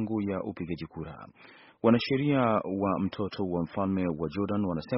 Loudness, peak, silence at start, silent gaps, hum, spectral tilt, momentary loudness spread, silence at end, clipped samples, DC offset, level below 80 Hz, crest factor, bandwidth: -29 LUFS; -10 dBFS; 0 s; none; none; -6 dB/octave; 14 LU; 0 s; under 0.1%; under 0.1%; -58 dBFS; 20 dB; 5.8 kHz